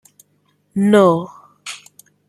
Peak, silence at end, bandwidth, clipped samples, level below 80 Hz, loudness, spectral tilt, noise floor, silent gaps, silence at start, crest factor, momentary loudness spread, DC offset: -2 dBFS; 0.55 s; 12.5 kHz; under 0.1%; -64 dBFS; -15 LUFS; -6.5 dB/octave; -62 dBFS; none; 0.75 s; 18 dB; 23 LU; under 0.1%